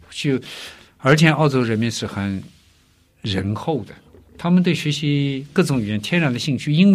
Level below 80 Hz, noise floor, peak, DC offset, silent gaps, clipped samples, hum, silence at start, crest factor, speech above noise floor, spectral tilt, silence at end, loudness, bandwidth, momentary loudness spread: -54 dBFS; -57 dBFS; -2 dBFS; under 0.1%; none; under 0.1%; none; 0.1 s; 18 dB; 38 dB; -6 dB/octave; 0 s; -20 LUFS; 14 kHz; 13 LU